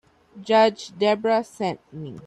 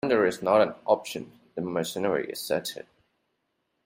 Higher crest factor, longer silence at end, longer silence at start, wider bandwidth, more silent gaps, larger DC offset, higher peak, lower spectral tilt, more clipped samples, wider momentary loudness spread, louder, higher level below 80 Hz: about the same, 16 dB vs 20 dB; second, 0.05 s vs 1.05 s; first, 0.35 s vs 0.05 s; second, 11 kHz vs 16 kHz; neither; neither; about the same, -6 dBFS vs -8 dBFS; about the same, -5 dB/octave vs -4.5 dB/octave; neither; first, 18 LU vs 15 LU; first, -22 LUFS vs -27 LUFS; about the same, -68 dBFS vs -68 dBFS